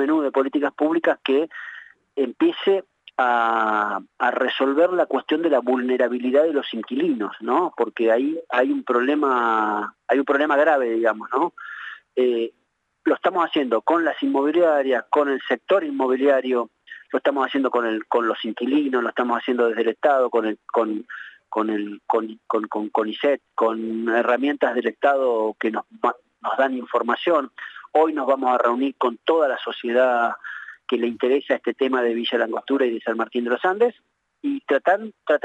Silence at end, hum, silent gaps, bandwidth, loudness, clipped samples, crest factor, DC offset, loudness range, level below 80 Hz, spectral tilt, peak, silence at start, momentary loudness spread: 0.05 s; none; none; 8.2 kHz; -22 LUFS; under 0.1%; 14 dB; under 0.1%; 2 LU; -82 dBFS; -5.5 dB/octave; -6 dBFS; 0 s; 8 LU